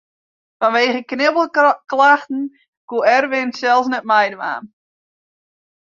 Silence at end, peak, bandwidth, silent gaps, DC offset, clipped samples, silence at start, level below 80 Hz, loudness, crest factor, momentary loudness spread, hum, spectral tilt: 1.2 s; -2 dBFS; 7.4 kHz; 2.68-2.88 s; under 0.1%; under 0.1%; 0.6 s; -70 dBFS; -16 LUFS; 16 dB; 12 LU; none; -3.5 dB/octave